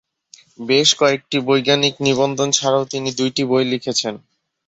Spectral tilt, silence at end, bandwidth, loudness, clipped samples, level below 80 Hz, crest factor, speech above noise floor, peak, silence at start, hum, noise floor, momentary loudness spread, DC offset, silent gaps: -3 dB/octave; 0.5 s; 8.4 kHz; -17 LUFS; under 0.1%; -60 dBFS; 18 dB; 32 dB; 0 dBFS; 0.6 s; none; -49 dBFS; 8 LU; under 0.1%; none